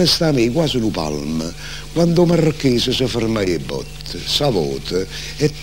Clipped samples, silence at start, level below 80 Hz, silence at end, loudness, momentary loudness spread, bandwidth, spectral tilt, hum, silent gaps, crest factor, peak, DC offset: under 0.1%; 0 s; -36 dBFS; 0 s; -18 LUFS; 12 LU; 16.5 kHz; -5 dB/octave; none; none; 16 dB; -2 dBFS; 1%